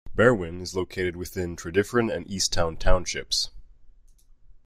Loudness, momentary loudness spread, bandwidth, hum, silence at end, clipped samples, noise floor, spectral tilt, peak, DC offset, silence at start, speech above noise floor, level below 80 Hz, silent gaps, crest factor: -26 LUFS; 11 LU; 15 kHz; none; 0.75 s; under 0.1%; -53 dBFS; -4 dB/octave; -4 dBFS; under 0.1%; 0.05 s; 29 dB; -34 dBFS; none; 20 dB